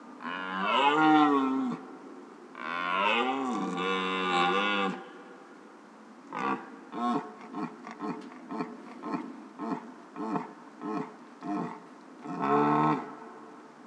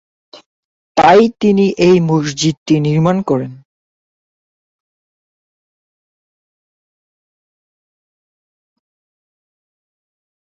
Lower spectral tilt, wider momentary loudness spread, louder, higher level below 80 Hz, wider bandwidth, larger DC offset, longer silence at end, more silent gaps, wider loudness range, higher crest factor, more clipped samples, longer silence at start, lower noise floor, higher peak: about the same, -5.5 dB/octave vs -6 dB/octave; first, 22 LU vs 10 LU; second, -30 LUFS vs -13 LUFS; second, under -90 dBFS vs -54 dBFS; first, 9.6 kHz vs 7.8 kHz; neither; second, 0 s vs 6.9 s; second, none vs 0.46-0.95 s, 2.57-2.66 s; about the same, 11 LU vs 10 LU; about the same, 20 dB vs 16 dB; neither; second, 0 s vs 0.35 s; second, -51 dBFS vs under -90 dBFS; second, -10 dBFS vs 0 dBFS